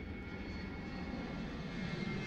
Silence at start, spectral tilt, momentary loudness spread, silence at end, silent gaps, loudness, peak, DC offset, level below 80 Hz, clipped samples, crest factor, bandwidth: 0 s; -6.5 dB/octave; 4 LU; 0 s; none; -43 LUFS; -28 dBFS; under 0.1%; -52 dBFS; under 0.1%; 14 dB; 8.8 kHz